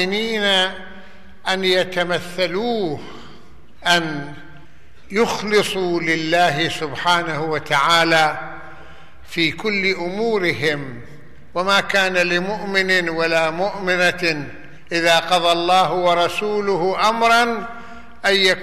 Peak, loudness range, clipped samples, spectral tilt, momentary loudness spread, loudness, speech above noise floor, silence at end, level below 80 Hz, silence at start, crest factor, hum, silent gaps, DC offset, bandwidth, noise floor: -4 dBFS; 5 LU; under 0.1%; -3.5 dB/octave; 13 LU; -18 LUFS; 30 dB; 0 s; -52 dBFS; 0 s; 16 dB; none; none; 2%; 13.5 kHz; -48 dBFS